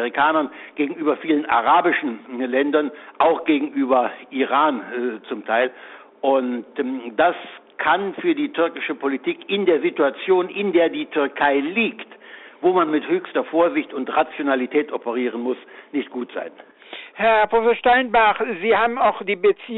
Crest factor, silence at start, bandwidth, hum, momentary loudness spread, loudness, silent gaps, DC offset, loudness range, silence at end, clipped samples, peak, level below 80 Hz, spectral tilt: 14 dB; 0 s; 4.1 kHz; none; 12 LU; -20 LUFS; none; under 0.1%; 3 LU; 0 s; under 0.1%; -6 dBFS; -60 dBFS; -2 dB/octave